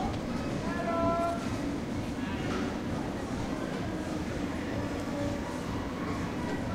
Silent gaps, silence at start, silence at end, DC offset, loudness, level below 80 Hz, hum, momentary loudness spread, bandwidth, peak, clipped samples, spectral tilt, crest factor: none; 0 s; 0 s; under 0.1%; -33 LUFS; -46 dBFS; none; 5 LU; 16 kHz; -16 dBFS; under 0.1%; -6 dB/octave; 16 dB